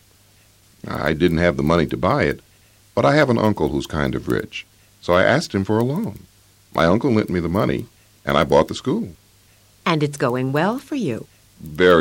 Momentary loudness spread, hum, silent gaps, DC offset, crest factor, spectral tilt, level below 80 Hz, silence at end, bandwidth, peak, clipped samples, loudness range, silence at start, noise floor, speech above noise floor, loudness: 15 LU; none; none; under 0.1%; 18 dB; -6.5 dB/octave; -42 dBFS; 0 s; 16.5 kHz; -4 dBFS; under 0.1%; 2 LU; 0.85 s; -54 dBFS; 35 dB; -20 LUFS